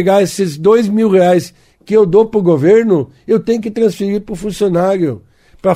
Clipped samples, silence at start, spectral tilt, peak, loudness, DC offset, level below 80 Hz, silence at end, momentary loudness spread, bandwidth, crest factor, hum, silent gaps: under 0.1%; 0 s; -7 dB/octave; 0 dBFS; -13 LUFS; under 0.1%; -46 dBFS; 0 s; 9 LU; 15.5 kHz; 12 dB; none; none